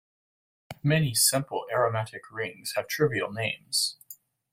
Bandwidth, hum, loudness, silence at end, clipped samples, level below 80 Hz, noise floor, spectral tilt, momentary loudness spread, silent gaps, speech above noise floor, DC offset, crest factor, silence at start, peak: 16.5 kHz; none; -27 LUFS; 0.4 s; under 0.1%; -62 dBFS; -52 dBFS; -3.5 dB/octave; 14 LU; none; 24 dB; under 0.1%; 20 dB; 0.7 s; -8 dBFS